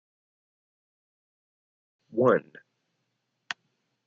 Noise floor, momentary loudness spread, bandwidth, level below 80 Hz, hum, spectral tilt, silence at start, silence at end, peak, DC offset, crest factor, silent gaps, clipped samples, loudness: -79 dBFS; 16 LU; 7.2 kHz; -78 dBFS; none; -5 dB/octave; 2.15 s; 1.65 s; -8 dBFS; under 0.1%; 24 dB; none; under 0.1%; -26 LUFS